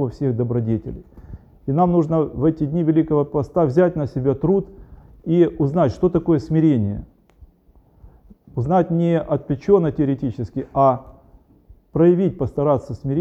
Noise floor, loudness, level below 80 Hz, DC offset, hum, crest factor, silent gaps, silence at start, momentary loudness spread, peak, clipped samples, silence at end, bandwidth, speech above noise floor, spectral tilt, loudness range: -54 dBFS; -19 LUFS; -44 dBFS; under 0.1%; none; 16 dB; none; 0 s; 10 LU; -4 dBFS; under 0.1%; 0 s; 7.4 kHz; 35 dB; -10.5 dB/octave; 2 LU